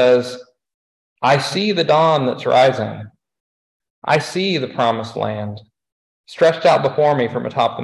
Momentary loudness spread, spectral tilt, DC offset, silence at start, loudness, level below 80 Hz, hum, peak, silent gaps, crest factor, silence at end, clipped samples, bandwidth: 15 LU; -5.5 dB/octave; under 0.1%; 0 s; -17 LUFS; -60 dBFS; none; -2 dBFS; 0.74-1.16 s, 3.40-3.80 s, 3.90-4.02 s, 5.92-6.24 s; 16 dB; 0 s; under 0.1%; 12 kHz